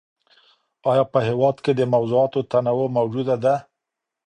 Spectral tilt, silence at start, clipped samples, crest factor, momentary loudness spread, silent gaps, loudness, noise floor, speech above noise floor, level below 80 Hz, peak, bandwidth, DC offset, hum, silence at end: -8 dB/octave; 0.85 s; under 0.1%; 16 dB; 3 LU; none; -21 LUFS; -83 dBFS; 64 dB; -62 dBFS; -4 dBFS; 9.6 kHz; under 0.1%; none; 0.65 s